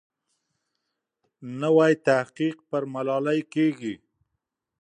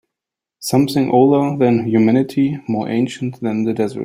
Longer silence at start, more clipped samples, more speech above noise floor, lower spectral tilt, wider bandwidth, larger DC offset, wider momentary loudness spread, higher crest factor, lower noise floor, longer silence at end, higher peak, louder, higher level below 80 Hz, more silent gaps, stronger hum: first, 1.4 s vs 0.6 s; neither; second, 58 dB vs 69 dB; about the same, -6.5 dB/octave vs -7 dB/octave; second, 9.8 kHz vs 16 kHz; neither; first, 16 LU vs 9 LU; first, 20 dB vs 14 dB; about the same, -82 dBFS vs -85 dBFS; first, 0.85 s vs 0 s; second, -8 dBFS vs -2 dBFS; second, -24 LUFS vs -16 LUFS; second, -76 dBFS vs -58 dBFS; neither; neither